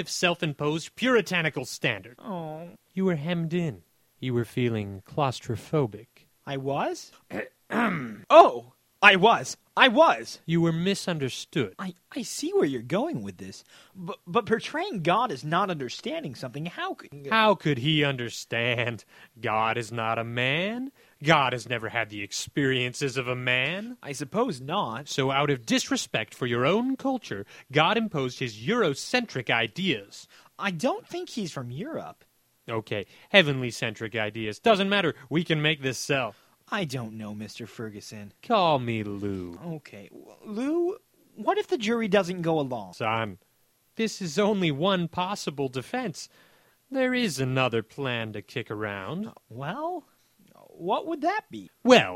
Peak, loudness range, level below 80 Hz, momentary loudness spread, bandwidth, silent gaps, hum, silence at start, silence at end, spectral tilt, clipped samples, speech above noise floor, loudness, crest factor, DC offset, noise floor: 0 dBFS; 8 LU; -66 dBFS; 16 LU; 16 kHz; none; none; 0 s; 0 s; -4.5 dB/octave; under 0.1%; 40 dB; -26 LUFS; 26 dB; under 0.1%; -67 dBFS